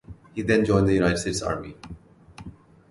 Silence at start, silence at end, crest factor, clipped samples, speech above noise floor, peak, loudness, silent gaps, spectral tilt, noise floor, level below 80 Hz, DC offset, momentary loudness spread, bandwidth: 0.1 s; 0.4 s; 18 dB; under 0.1%; 24 dB; -8 dBFS; -23 LUFS; none; -5.5 dB/octave; -47 dBFS; -44 dBFS; under 0.1%; 24 LU; 11.5 kHz